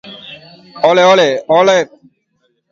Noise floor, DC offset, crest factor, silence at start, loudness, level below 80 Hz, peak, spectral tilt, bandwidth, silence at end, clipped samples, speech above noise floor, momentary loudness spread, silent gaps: -63 dBFS; under 0.1%; 14 dB; 0.05 s; -10 LUFS; -62 dBFS; 0 dBFS; -4 dB/octave; 7.6 kHz; 0.85 s; under 0.1%; 53 dB; 23 LU; none